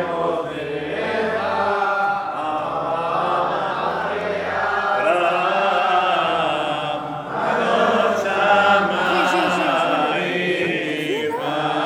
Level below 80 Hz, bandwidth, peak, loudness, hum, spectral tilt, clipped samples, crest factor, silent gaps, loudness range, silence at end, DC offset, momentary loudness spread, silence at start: -58 dBFS; 16 kHz; -2 dBFS; -20 LUFS; none; -4.5 dB/octave; under 0.1%; 16 dB; none; 4 LU; 0 s; under 0.1%; 7 LU; 0 s